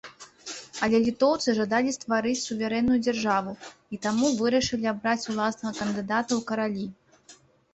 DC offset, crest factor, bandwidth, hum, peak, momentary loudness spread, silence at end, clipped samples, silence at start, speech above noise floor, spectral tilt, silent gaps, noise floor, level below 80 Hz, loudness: under 0.1%; 18 dB; 8.2 kHz; none; -10 dBFS; 15 LU; 0.4 s; under 0.1%; 0.05 s; 30 dB; -4 dB/octave; none; -55 dBFS; -58 dBFS; -26 LUFS